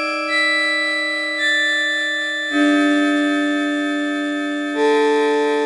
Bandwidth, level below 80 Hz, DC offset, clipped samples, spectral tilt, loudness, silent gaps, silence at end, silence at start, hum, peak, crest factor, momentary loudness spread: 11.5 kHz; -80 dBFS; under 0.1%; under 0.1%; -2 dB/octave; -17 LUFS; none; 0 s; 0 s; none; -4 dBFS; 14 dB; 6 LU